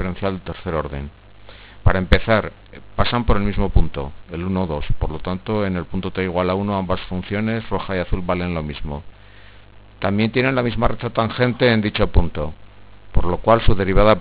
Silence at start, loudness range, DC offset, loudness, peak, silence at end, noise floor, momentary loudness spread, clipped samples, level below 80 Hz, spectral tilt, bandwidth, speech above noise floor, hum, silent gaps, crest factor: 0 s; 4 LU; under 0.1%; -21 LUFS; 0 dBFS; 0 s; -44 dBFS; 12 LU; under 0.1%; -28 dBFS; -10.5 dB/octave; 4 kHz; 26 dB; 50 Hz at -45 dBFS; none; 18 dB